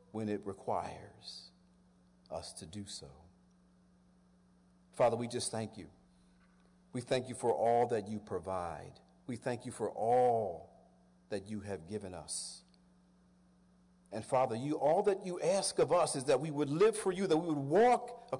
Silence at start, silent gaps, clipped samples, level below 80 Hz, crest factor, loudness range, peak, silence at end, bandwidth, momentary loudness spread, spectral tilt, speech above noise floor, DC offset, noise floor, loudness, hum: 0.15 s; none; under 0.1%; -72 dBFS; 14 dB; 13 LU; -22 dBFS; 0 s; 11 kHz; 17 LU; -5 dB/octave; 32 dB; under 0.1%; -67 dBFS; -34 LUFS; none